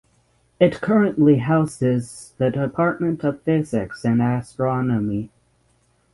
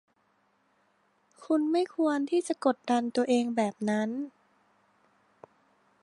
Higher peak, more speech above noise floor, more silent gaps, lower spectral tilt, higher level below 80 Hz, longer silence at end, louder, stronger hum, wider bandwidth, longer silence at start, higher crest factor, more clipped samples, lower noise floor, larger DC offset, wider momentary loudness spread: first, -2 dBFS vs -12 dBFS; about the same, 42 dB vs 43 dB; neither; first, -8 dB/octave vs -5 dB/octave; first, -52 dBFS vs -82 dBFS; second, 0.85 s vs 1.75 s; first, -21 LUFS vs -29 LUFS; neither; about the same, 11.5 kHz vs 11.5 kHz; second, 0.6 s vs 1.4 s; about the same, 18 dB vs 20 dB; neither; second, -62 dBFS vs -71 dBFS; neither; first, 9 LU vs 4 LU